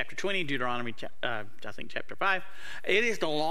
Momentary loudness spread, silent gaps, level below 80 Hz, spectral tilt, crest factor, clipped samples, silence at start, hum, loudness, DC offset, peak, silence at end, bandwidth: 13 LU; none; -64 dBFS; -4 dB/octave; 20 dB; under 0.1%; 0 s; none; -31 LUFS; 3%; -10 dBFS; 0 s; 15.5 kHz